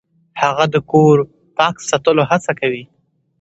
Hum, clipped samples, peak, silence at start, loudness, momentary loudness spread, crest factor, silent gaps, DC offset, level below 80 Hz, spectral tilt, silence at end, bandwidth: none; under 0.1%; 0 dBFS; 0.35 s; -15 LUFS; 10 LU; 16 dB; none; under 0.1%; -56 dBFS; -5.5 dB/octave; 0.55 s; 8.2 kHz